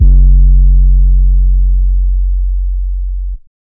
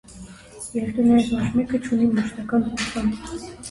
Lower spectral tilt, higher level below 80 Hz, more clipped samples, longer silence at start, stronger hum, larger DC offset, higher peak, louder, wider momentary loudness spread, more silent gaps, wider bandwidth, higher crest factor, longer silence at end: first, -15 dB/octave vs -5.5 dB/octave; first, -8 dBFS vs -46 dBFS; first, 0.9% vs under 0.1%; about the same, 0 s vs 0.1 s; neither; neither; first, 0 dBFS vs -8 dBFS; first, -12 LUFS vs -22 LUFS; second, 11 LU vs 18 LU; neither; second, 0.5 kHz vs 11.5 kHz; second, 8 dB vs 14 dB; first, 0.3 s vs 0 s